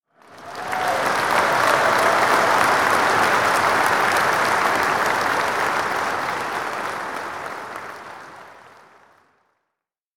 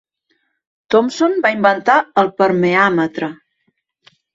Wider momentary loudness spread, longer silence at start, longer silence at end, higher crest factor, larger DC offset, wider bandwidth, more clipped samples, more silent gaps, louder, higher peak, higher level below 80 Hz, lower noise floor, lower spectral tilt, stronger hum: first, 16 LU vs 7 LU; second, 0.3 s vs 0.9 s; first, 1.55 s vs 1 s; about the same, 20 dB vs 16 dB; neither; first, 17.5 kHz vs 7.8 kHz; neither; neither; second, -19 LUFS vs -15 LUFS; about the same, -2 dBFS vs 0 dBFS; about the same, -58 dBFS vs -62 dBFS; first, -82 dBFS vs -67 dBFS; second, -2.5 dB/octave vs -5.5 dB/octave; neither